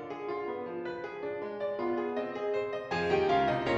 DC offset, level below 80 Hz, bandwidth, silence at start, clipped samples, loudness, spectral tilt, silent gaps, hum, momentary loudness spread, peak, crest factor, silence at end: under 0.1%; -62 dBFS; 7.8 kHz; 0 s; under 0.1%; -33 LUFS; -6.5 dB/octave; none; none; 10 LU; -16 dBFS; 16 dB; 0 s